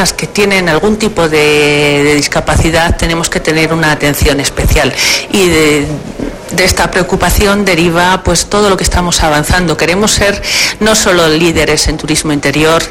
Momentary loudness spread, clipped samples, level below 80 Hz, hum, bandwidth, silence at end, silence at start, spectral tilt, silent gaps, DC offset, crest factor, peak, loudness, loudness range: 4 LU; under 0.1%; -22 dBFS; none; 17 kHz; 0 s; 0 s; -3.5 dB/octave; none; under 0.1%; 10 dB; 0 dBFS; -9 LUFS; 1 LU